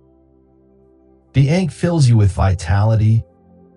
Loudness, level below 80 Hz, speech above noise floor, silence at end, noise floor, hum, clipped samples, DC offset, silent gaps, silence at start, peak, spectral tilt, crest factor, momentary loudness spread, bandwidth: -16 LUFS; -36 dBFS; 38 dB; 0.55 s; -52 dBFS; none; under 0.1%; under 0.1%; none; 1.35 s; -4 dBFS; -7.5 dB/octave; 14 dB; 5 LU; 11 kHz